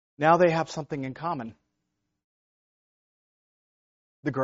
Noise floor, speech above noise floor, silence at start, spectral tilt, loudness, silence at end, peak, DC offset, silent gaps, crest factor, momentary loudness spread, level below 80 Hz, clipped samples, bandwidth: -80 dBFS; 56 dB; 0.2 s; -5.5 dB/octave; -26 LUFS; 0 s; -6 dBFS; under 0.1%; 2.24-4.23 s; 22 dB; 15 LU; -68 dBFS; under 0.1%; 7.6 kHz